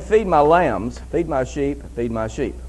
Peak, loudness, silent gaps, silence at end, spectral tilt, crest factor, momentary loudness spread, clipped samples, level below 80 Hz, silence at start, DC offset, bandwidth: -2 dBFS; -20 LUFS; none; 0 s; -6.5 dB/octave; 18 dB; 11 LU; under 0.1%; -34 dBFS; 0 s; under 0.1%; 11.5 kHz